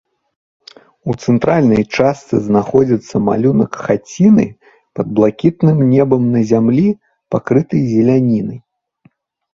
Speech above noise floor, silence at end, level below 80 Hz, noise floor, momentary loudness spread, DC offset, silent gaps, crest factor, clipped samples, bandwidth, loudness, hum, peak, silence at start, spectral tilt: 41 dB; 0.95 s; -48 dBFS; -53 dBFS; 10 LU; under 0.1%; none; 14 dB; under 0.1%; 7.6 kHz; -14 LUFS; none; 0 dBFS; 1.05 s; -8.5 dB/octave